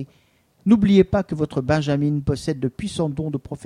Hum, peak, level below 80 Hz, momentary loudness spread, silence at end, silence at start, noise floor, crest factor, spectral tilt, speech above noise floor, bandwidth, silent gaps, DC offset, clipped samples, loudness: none; -4 dBFS; -44 dBFS; 12 LU; 0 s; 0 s; -60 dBFS; 18 dB; -7.5 dB/octave; 40 dB; 11 kHz; none; under 0.1%; under 0.1%; -21 LUFS